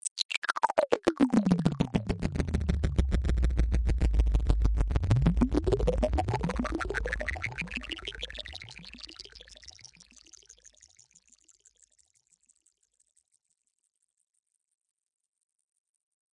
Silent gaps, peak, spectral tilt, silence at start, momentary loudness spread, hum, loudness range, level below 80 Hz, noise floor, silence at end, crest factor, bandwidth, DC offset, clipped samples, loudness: 0.11-0.16 s, 0.25-0.29 s, 0.38-0.42 s; -6 dBFS; -6 dB/octave; 0.05 s; 18 LU; none; 17 LU; -34 dBFS; -76 dBFS; 6.65 s; 24 dB; 11 kHz; under 0.1%; under 0.1%; -29 LUFS